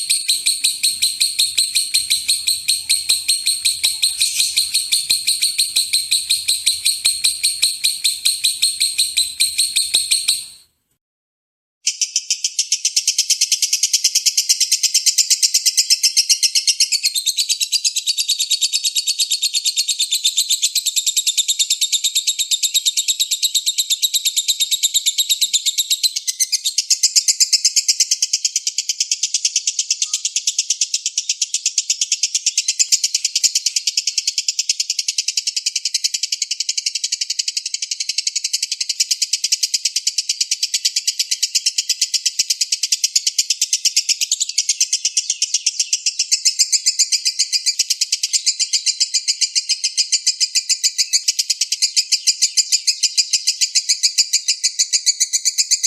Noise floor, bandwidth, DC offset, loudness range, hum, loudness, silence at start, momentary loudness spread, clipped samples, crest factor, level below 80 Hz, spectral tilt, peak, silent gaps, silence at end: -46 dBFS; 16 kHz; under 0.1%; 4 LU; none; -15 LUFS; 0 s; 5 LU; under 0.1%; 18 dB; -70 dBFS; 6 dB/octave; 0 dBFS; 11.01-11.81 s; 0 s